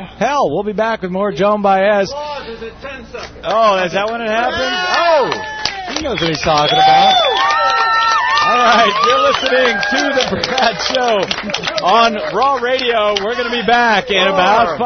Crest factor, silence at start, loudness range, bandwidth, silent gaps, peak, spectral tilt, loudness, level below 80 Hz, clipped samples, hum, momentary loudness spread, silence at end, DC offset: 14 dB; 0 s; 5 LU; 6.6 kHz; none; 0 dBFS; -3.5 dB/octave; -13 LUFS; -44 dBFS; under 0.1%; none; 9 LU; 0 s; under 0.1%